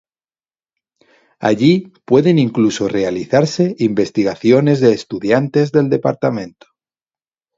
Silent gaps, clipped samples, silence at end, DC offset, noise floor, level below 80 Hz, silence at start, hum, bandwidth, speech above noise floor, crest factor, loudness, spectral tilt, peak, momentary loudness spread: none; under 0.1%; 1.1 s; under 0.1%; under -90 dBFS; -56 dBFS; 1.4 s; none; 7.8 kHz; over 76 dB; 16 dB; -15 LUFS; -7 dB/octave; 0 dBFS; 7 LU